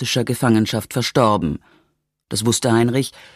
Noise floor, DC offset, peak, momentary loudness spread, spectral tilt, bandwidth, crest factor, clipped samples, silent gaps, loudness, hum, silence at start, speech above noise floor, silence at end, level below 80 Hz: -67 dBFS; under 0.1%; -2 dBFS; 8 LU; -5 dB/octave; 15 kHz; 18 dB; under 0.1%; none; -18 LUFS; none; 0 s; 48 dB; 0.15 s; -48 dBFS